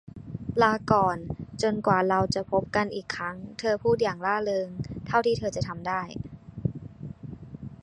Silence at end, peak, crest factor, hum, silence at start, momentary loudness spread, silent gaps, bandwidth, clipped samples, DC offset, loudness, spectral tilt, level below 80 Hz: 0.1 s; -6 dBFS; 22 dB; none; 0.15 s; 17 LU; none; 11 kHz; under 0.1%; under 0.1%; -27 LUFS; -6 dB/octave; -50 dBFS